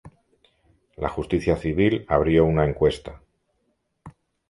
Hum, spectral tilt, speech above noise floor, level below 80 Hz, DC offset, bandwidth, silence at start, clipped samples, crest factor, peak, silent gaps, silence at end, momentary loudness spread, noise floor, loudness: none; -8 dB/octave; 51 dB; -40 dBFS; under 0.1%; 11.5 kHz; 0.05 s; under 0.1%; 20 dB; -4 dBFS; none; 0.4 s; 12 LU; -72 dBFS; -22 LUFS